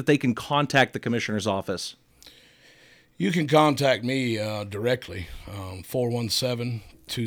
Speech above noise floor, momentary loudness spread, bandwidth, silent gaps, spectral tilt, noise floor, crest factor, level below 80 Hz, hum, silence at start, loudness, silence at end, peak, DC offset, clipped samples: 30 dB; 16 LU; over 20 kHz; none; -5 dB/octave; -55 dBFS; 20 dB; -54 dBFS; none; 0 s; -25 LUFS; 0 s; -6 dBFS; under 0.1%; under 0.1%